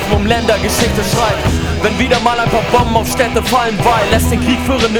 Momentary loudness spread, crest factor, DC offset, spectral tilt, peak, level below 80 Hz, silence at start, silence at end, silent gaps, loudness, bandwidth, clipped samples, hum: 2 LU; 12 dB; under 0.1%; -4.5 dB/octave; 0 dBFS; -24 dBFS; 0 s; 0 s; none; -13 LUFS; over 20 kHz; under 0.1%; none